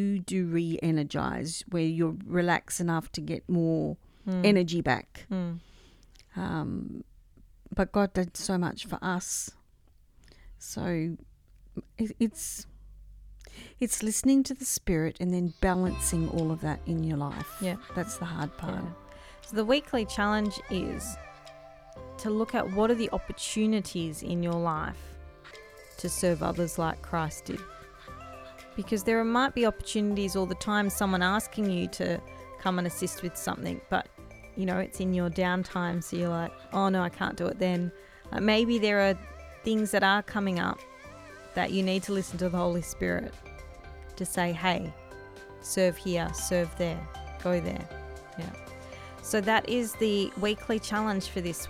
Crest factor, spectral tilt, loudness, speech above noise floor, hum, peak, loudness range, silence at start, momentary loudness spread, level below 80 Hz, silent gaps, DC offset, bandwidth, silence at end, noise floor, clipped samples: 22 dB; -5 dB/octave; -30 LUFS; 31 dB; none; -8 dBFS; 5 LU; 0 s; 19 LU; -48 dBFS; none; under 0.1%; 16.5 kHz; 0 s; -60 dBFS; under 0.1%